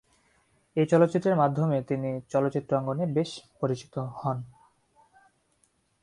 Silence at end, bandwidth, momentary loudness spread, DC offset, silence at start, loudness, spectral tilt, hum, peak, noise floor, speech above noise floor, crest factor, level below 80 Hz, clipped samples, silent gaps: 1.55 s; 11 kHz; 12 LU; under 0.1%; 0.75 s; -27 LUFS; -8 dB/octave; none; -8 dBFS; -70 dBFS; 43 dB; 20 dB; -66 dBFS; under 0.1%; none